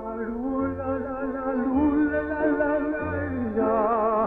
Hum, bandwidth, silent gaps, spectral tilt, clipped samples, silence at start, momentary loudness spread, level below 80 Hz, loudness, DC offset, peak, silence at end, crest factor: none; 3.8 kHz; none; -10.5 dB/octave; under 0.1%; 0 s; 7 LU; -48 dBFS; -25 LUFS; under 0.1%; -12 dBFS; 0 s; 12 dB